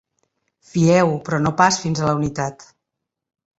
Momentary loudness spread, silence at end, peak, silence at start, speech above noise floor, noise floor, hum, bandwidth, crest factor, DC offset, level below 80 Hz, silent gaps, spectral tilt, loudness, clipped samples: 12 LU; 0.95 s; -2 dBFS; 0.75 s; 64 dB; -82 dBFS; none; 8 kHz; 18 dB; under 0.1%; -52 dBFS; none; -5.5 dB/octave; -19 LUFS; under 0.1%